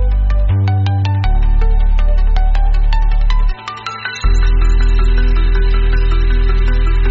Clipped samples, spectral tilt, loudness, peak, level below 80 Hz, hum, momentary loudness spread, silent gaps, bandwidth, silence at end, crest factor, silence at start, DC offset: under 0.1%; -5.5 dB/octave; -16 LUFS; -2 dBFS; -12 dBFS; none; 3 LU; none; 7 kHz; 0 s; 8 dB; 0 s; under 0.1%